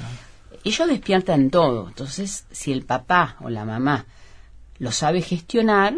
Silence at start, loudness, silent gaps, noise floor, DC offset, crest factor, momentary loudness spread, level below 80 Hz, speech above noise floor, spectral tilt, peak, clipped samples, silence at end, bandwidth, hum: 0 s; -22 LUFS; none; -44 dBFS; under 0.1%; 20 dB; 12 LU; -46 dBFS; 23 dB; -5 dB/octave; -2 dBFS; under 0.1%; 0 s; 11 kHz; none